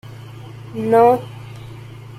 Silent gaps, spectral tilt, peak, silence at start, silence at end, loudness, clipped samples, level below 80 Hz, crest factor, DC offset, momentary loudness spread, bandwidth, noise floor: none; -7.5 dB/octave; -2 dBFS; 0.1 s; 0.05 s; -16 LUFS; under 0.1%; -54 dBFS; 18 dB; under 0.1%; 23 LU; 14 kHz; -35 dBFS